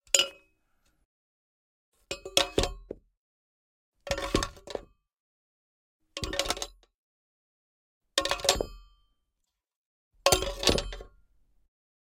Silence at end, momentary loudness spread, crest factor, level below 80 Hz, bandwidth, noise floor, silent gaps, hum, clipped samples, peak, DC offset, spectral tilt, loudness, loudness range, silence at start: 1 s; 18 LU; 30 dB; -46 dBFS; 17 kHz; -83 dBFS; 1.05-1.92 s, 3.17-3.92 s, 5.20-5.99 s, 6.94-8.01 s, 9.76-10.11 s; none; under 0.1%; -4 dBFS; under 0.1%; -2 dB/octave; -28 LUFS; 8 LU; 0.15 s